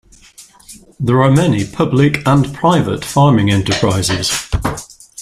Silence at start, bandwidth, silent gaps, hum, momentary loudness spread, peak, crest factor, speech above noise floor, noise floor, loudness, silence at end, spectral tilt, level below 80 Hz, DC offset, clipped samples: 0.4 s; 14.5 kHz; none; none; 9 LU; 0 dBFS; 14 dB; 30 dB; -42 dBFS; -14 LUFS; 0 s; -5.5 dB/octave; -36 dBFS; under 0.1%; under 0.1%